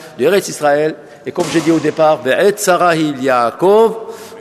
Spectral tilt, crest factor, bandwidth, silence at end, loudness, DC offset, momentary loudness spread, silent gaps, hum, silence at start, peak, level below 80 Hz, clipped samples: -4.5 dB/octave; 12 dB; 13.5 kHz; 0 s; -13 LUFS; under 0.1%; 9 LU; none; none; 0 s; 0 dBFS; -58 dBFS; under 0.1%